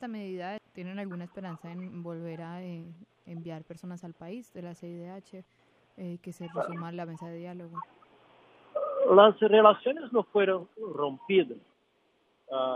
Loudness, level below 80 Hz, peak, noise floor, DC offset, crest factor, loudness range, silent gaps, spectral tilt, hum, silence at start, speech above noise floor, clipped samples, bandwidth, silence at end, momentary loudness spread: -26 LUFS; -82 dBFS; -4 dBFS; -70 dBFS; under 0.1%; 26 dB; 19 LU; none; -7 dB/octave; none; 0 s; 42 dB; under 0.1%; 9.2 kHz; 0 s; 24 LU